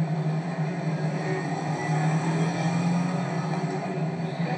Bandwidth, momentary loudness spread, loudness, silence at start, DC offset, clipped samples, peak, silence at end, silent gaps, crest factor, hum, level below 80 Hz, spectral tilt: 9.6 kHz; 4 LU; -27 LUFS; 0 s; under 0.1%; under 0.1%; -14 dBFS; 0 s; none; 12 dB; none; -76 dBFS; -7 dB/octave